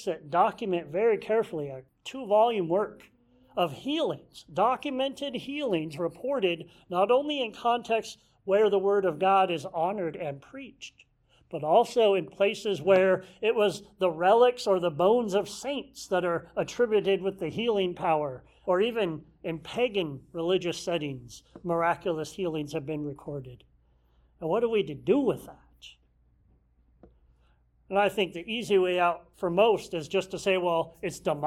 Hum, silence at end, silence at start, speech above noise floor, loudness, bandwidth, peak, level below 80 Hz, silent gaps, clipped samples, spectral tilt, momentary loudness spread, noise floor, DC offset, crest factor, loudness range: none; 0 s; 0 s; 38 dB; -28 LUFS; 14 kHz; -10 dBFS; -64 dBFS; none; under 0.1%; -5.5 dB/octave; 14 LU; -65 dBFS; under 0.1%; 18 dB; 7 LU